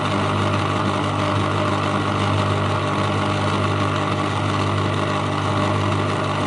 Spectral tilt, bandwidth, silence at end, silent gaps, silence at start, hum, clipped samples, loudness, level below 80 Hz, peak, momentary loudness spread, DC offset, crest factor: -6 dB/octave; 11 kHz; 0 s; none; 0 s; 50 Hz at -25 dBFS; under 0.1%; -21 LUFS; -50 dBFS; -6 dBFS; 1 LU; under 0.1%; 14 dB